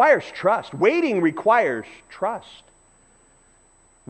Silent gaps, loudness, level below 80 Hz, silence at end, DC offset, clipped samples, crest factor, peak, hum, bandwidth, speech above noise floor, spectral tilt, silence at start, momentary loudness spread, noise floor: none; -21 LUFS; -64 dBFS; 1.7 s; under 0.1%; under 0.1%; 18 dB; -4 dBFS; none; 8.4 kHz; 36 dB; -6 dB/octave; 0 s; 12 LU; -57 dBFS